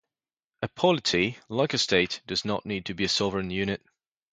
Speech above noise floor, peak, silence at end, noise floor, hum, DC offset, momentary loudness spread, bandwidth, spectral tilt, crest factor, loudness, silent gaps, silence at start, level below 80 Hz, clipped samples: over 63 dB; -8 dBFS; 0.6 s; under -90 dBFS; none; under 0.1%; 9 LU; 9.4 kHz; -4 dB/octave; 22 dB; -27 LUFS; none; 0.6 s; -56 dBFS; under 0.1%